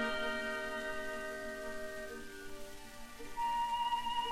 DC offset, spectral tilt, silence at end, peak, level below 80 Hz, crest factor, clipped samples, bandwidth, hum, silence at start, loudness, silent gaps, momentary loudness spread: under 0.1%; -2.5 dB/octave; 0 s; -24 dBFS; -56 dBFS; 14 dB; under 0.1%; 16.5 kHz; none; 0 s; -39 LUFS; none; 15 LU